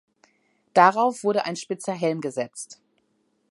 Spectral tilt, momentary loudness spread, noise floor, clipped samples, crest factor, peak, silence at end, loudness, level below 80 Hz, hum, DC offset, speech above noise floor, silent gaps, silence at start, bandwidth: -4.5 dB/octave; 15 LU; -70 dBFS; under 0.1%; 24 dB; -2 dBFS; 0.8 s; -23 LUFS; -76 dBFS; none; under 0.1%; 47 dB; none; 0.75 s; 11.5 kHz